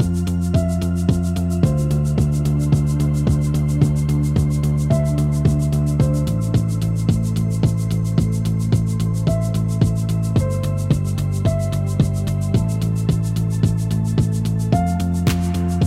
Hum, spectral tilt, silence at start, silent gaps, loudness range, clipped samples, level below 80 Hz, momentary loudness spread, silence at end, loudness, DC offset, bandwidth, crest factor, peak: none; -7.5 dB/octave; 0 s; none; 2 LU; under 0.1%; -30 dBFS; 3 LU; 0 s; -19 LUFS; under 0.1%; 15.5 kHz; 14 dB; -4 dBFS